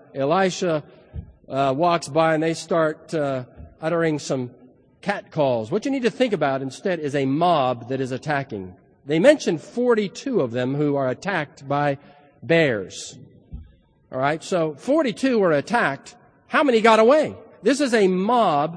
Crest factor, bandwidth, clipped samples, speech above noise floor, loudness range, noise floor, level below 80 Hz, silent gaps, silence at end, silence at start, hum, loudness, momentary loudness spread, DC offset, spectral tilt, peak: 20 dB; 10.5 kHz; under 0.1%; 31 dB; 5 LU; -52 dBFS; -54 dBFS; none; 0 s; 0.15 s; none; -21 LUFS; 13 LU; under 0.1%; -5.5 dB/octave; -2 dBFS